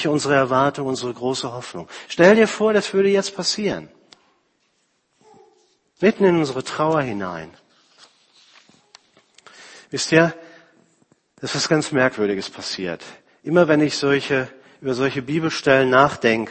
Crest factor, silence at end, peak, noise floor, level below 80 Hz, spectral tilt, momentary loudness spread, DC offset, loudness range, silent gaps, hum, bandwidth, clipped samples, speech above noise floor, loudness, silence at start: 20 dB; 0 s; 0 dBFS; -67 dBFS; -60 dBFS; -4.5 dB/octave; 15 LU; under 0.1%; 6 LU; none; none; 8.8 kHz; under 0.1%; 48 dB; -19 LUFS; 0 s